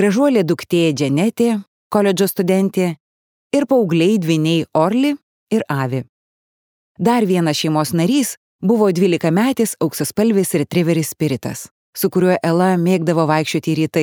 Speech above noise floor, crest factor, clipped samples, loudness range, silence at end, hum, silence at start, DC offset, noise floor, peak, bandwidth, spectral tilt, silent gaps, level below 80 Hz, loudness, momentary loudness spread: over 74 dB; 16 dB; under 0.1%; 2 LU; 0 s; none; 0 s; under 0.1%; under -90 dBFS; -2 dBFS; 19.5 kHz; -6 dB/octave; 1.67-1.90 s, 3.00-3.50 s, 5.23-5.47 s, 6.09-6.95 s, 8.37-8.59 s, 11.71-11.93 s; -62 dBFS; -17 LUFS; 7 LU